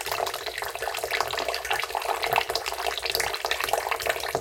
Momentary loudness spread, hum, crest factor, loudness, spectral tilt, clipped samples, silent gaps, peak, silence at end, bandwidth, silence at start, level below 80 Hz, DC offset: 5 LU; none; 24 dB; -27 LUFS; -1 dB/octave; under 0.1%; none; -6 dBFS; 0 s; 17 kHz; 0 s; -54 dBFS; under 0.1%